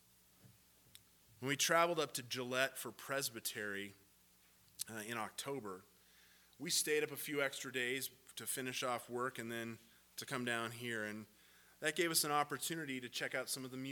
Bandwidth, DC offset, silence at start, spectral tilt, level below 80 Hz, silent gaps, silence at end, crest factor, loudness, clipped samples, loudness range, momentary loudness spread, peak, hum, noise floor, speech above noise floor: 19 kHz; under 0.1%; 0.45 s; -2.5 dB/octave; -84 dBFS; none; 0 s; 24 dB; -40 LUFS; under 0.1%; 6 LU; 14 LU; -18 dBFS; none; -70 dBFS; 29 dB